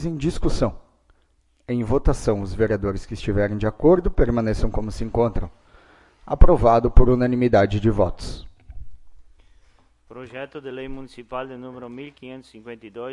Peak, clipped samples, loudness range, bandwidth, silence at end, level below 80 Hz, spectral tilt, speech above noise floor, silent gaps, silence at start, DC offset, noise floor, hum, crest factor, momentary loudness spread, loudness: 0 dBFS; under 0.1%; 16 LU; 11 kHz; 0 s; -26 dBFS; -7.5 dB/octave; 43 dB; none; 0 s; under 0.1%; -62 dBFS; none; 20 dB; 20 LU; -21 LUFS